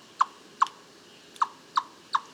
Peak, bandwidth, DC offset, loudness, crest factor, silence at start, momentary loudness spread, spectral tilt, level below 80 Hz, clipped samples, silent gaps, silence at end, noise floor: -8 dBFS; 14 kHz; under 0.1%; -30 LUFS; 22 dB; 0.2 s; 21 LU; -0.5 dB/octave; -86 dBFS; under 0.1%; none; 0.1 s; -52 dBFS